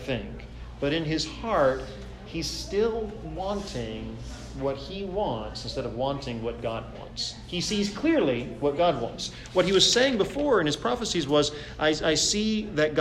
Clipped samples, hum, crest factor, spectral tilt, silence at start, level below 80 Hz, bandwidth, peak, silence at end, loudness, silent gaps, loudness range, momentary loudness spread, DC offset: under 0.1%; none; 20 dB; -4 dB/octave; 0 s; -44 dBFS; 14.5 kHz; -6 dBFS; 0 s; -27 LUFS; none; 8 LU; 13 LU; under 0.1%